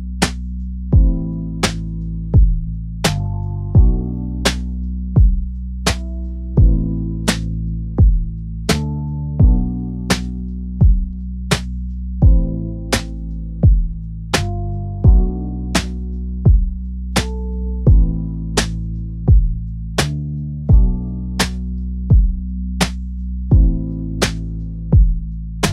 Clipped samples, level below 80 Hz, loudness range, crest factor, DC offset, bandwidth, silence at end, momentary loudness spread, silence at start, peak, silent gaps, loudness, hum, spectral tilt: under 0.1%; -18 dBFS; 1 LU; 16 dB; 0.1%; 13.5 kHz; 0 s; 12 LU; 0 s; 0 dBFS; none; -19 LUFS; none; -5.5 dB/octave